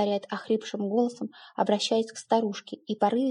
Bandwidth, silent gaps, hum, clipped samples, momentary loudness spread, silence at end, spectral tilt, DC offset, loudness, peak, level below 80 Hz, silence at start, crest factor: 11 kHz; none; none; under 0.1%; 11 LU; 0 s; -5 dB/octave; under 0.1%; -28 LUFS; -8 dBFS; -88 dBFS; 0 s; 18 dB